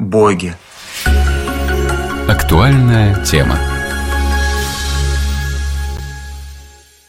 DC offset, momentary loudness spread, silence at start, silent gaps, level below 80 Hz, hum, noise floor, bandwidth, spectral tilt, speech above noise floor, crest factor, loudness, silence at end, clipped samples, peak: under 0.1%; 17 LU; 0 s; none; -18 dBFS; none; -39 dBFS; 16.5 kHz; -5.5 dB/octave; 29 dB; 14 dB; -14 LUFS; 0.35 s; under 0.1%; 0 dBFS